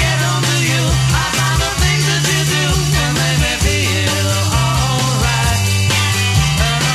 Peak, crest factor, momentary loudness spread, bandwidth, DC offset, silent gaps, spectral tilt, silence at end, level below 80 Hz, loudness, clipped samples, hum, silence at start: -2 dBFS; 12 dB; 1 LU; 15.5 kHz; under 0.1%; none; -3.5 dB/octave; 0 s; -24 dBFS; -14 LUFS; under 0.1%; none; 0 s